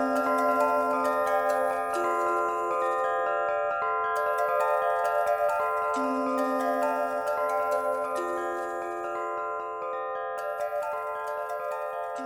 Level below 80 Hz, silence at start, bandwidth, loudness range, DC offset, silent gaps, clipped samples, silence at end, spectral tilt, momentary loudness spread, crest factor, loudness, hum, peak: -68 dBFS; 0 s; 18.5 kHz; 6 LU; under 0.1%; none; under 0.1%; 0 s; -4 dB/octave; 7 LU; 16 dB; -28 LUFS; none; -12 dBFS